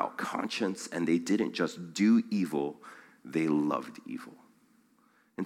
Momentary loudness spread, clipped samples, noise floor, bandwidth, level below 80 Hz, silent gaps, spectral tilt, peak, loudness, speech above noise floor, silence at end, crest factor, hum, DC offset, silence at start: 21 LU; under 0.1%; -67 dBFS; 14.5 kHz; -80 dBFS; none; -5.5 dB/octave; -14 dBFS; -30 LUFS; 37 dB; 0 s; 18 dB; none; under 0.1%; 0 s